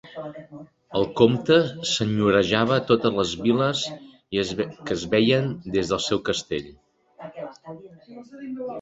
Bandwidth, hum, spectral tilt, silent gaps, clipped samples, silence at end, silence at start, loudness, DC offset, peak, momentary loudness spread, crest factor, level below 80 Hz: 8 kHz; none; -5 dB/octave; none; under 0.1%; 0 s; 0.05 s; -23 LUFS; under 0.1%; -2 dBFS; 21 LU; 22 dB; -54 dBFS